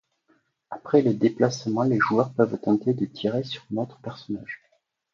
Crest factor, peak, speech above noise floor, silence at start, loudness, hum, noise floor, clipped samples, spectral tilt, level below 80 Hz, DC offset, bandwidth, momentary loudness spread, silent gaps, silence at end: 20 dB; -6 dBFS; 43 dB; 0.7 s; -24 LUFS; none; -67 dBFS; under 0.1%; -6.5 dB/octave; -66 dBFS; under 0.1%; 7.4 kHz; 17 LU; none; 0.6 s